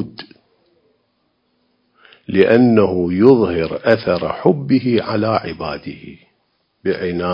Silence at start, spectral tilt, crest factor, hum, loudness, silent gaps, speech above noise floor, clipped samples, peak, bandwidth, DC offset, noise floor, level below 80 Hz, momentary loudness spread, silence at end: 0 s; -9.5 dB/octave; 18 dB; none; -16 LUFS; none; 50 dB; under 0.1%; 0 dBFS; 5.4 kHz; under 0.1%; -65 dBFS; -46 dBFS; 16 LU; 0 s